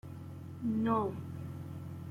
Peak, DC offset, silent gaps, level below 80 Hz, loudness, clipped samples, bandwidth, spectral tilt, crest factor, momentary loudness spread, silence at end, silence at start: -18 dBFS; under 0.1%; none; -68 dBFS; -37 LUFS; under 0.1%; 15.5 kHz; -9 dB/octave; 18 dB; 15 LU; 0 s; 0.05 s